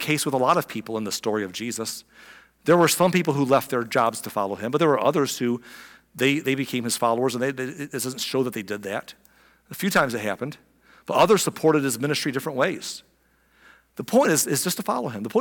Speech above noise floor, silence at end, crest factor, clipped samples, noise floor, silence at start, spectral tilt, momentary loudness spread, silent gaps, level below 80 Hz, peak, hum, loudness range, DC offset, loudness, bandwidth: 40 dB; 0 s; 16 dB; under 0.1%; -63 dBFS; 0 s; -4 dB/octave; 13 LU; none; -66 dBFS; -8 dBFS; none; 5 LU; under 0.1%; -23 LUFS; 18 kHz